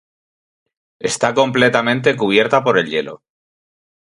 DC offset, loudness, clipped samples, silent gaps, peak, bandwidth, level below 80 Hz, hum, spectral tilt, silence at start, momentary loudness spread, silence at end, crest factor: under 0.1%; -16 LUFS; under 0.1%; none; 0 dBFS; 11.5 kHz; -58 dBFS; none; -4 dB/octave; 1 s; 9 LU; 0.85 s; 18 dB